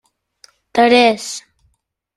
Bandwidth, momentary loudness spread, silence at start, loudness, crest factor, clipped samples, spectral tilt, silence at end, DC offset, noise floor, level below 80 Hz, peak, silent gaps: 13 kHz; 17 LU; 0.75 s; -14 LUFS; 16 dB; under 0.1%; -2.5 dB/octave; 0.75 s; under 0.1%; -66 dBFS; -60 dBFS; 0 dBFS; none